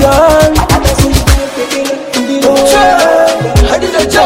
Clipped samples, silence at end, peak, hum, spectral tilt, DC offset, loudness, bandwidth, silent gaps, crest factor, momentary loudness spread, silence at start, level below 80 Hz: 3%; 0 s; 0 dBFS; none; -4.5 dB/octave; under 0.1%; -8 LUFS; over 20 kHz; none; 8 dB; 8 LU; 0 s; -16 dBFS